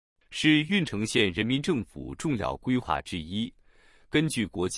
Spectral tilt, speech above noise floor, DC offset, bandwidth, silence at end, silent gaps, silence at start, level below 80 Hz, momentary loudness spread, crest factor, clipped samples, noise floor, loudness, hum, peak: -5 dB/octave; 31 dB; under 0.1%; 12 kHz; 0 s; none; 0.3 s; -52 dBFS; 11 LU; 20 dB; under 0.1%; -58 dBFS; -27 LUFS; none; -8 dBFS